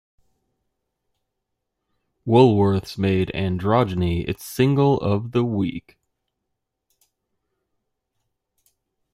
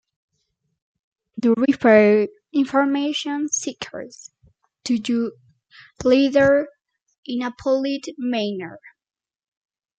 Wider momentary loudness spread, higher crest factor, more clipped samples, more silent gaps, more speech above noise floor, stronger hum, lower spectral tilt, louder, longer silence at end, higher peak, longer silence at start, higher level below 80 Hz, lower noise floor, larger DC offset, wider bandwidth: second, 11 LU vs 19 LU; about the same, 20 dB vs 20 dB; neither; second, none vs 7.18-7.23 s; first, 60 dB vs 54 dB; neither; first, -7.5 dB/octave vs -4 dB/octave; about the same, -20 LUFS vs -20 LUFS; first, 3.35 s vs 1.2 s; about the same, -2 dBFS vs -2 dBFS; first, 2.25 s vs 1.35 s; first, -50 dBFS vs -60 dBFS; first, -79 dBFS vs -73 dBFS; neither; first, 16 kHz vs 9.2 kHz